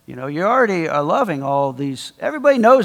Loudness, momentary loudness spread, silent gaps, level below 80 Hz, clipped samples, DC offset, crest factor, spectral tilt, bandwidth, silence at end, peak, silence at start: -18 LUFS; 11 LU; none; -64 dBFS; under 0.1%; under 0.1%; 16 dB; -6 dB/octave; 13 kHz; 0 s; 0 dBFS; 0.1 s